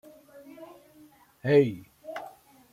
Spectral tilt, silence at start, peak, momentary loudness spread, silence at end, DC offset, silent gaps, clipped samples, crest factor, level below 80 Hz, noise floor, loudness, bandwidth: -8 dB/octave; 0.6 s; -8 dBFS; 26 LU; 0.45 s; under 0.1%; none; under 0.1%; 22 dB; -72 dBFS; -57 dBFS; -25 LUFS; 15 kHz